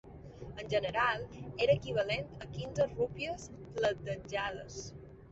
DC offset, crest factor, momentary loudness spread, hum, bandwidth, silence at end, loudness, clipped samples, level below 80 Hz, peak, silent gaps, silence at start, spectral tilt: under 0.1%; 20 dB; 15 LU; none; 8 kHz; 0 s; -35 LUFS; under 0.1%; -56 dBFS; -16 dBFS; none; 0.05 s; -3.5 dB/octave